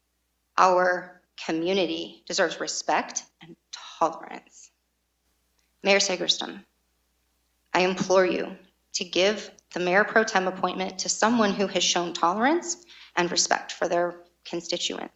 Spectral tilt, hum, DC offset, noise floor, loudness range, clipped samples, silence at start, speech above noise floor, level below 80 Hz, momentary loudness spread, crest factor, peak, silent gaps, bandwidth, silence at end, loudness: -2.5 dB/octave; none; under 0.1%; -74 dBFS; 5 LU; under 0.1%; 0.55 s; 49 dB; -68 dBFS; 15 LU; 22 dB; -4 dBFS; none; 8.6 kHz; 0.1 s; -25 LUFS